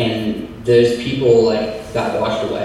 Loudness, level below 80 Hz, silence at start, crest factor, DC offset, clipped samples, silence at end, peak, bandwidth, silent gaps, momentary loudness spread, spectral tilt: -17 LUFS; -44 dBFS; 0 s; 16 dB; under 0.1%; under 0.1%; 0 s; 0 dBFS; 12.5 kHz; none; 9 LU; -6.5 dB/octave